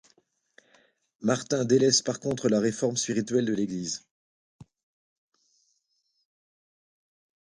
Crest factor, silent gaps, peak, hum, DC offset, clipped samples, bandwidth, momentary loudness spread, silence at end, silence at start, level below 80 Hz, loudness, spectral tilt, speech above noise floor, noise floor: 22 dB; 4.11-4.59 s; -8 dBFS; none; under 0.1%; under 0.1%; 11.5 kHz; 11 LU; 2.95 s; 1.2 s; -68 dBFS; -26 LUFS; -4 dB/octave; 49 dB; -75 dBFS